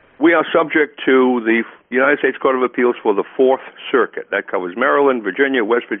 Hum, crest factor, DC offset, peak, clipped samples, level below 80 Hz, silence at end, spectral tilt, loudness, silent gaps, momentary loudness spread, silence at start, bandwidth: none; 16 dB; under 0.1%; 0 dBFS; under 0.1%; -66 dBFS; 0 s; -2.5 dB/octave; -16 LUFS; none; 6 LU; 0.2 s; 3.8 kHz